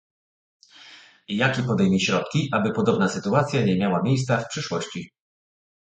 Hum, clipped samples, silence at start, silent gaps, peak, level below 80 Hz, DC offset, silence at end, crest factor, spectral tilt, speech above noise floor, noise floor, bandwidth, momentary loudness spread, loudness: none; under 0.1%; 0.8 s; none; -4 dBFS; -56 dBFS; under 0.1%; 0.85 s; 20 dB; -5.5 dB/octave; 26 dB; -49 dBFS; 9.2 kHz; 9 LU; -23 LUFS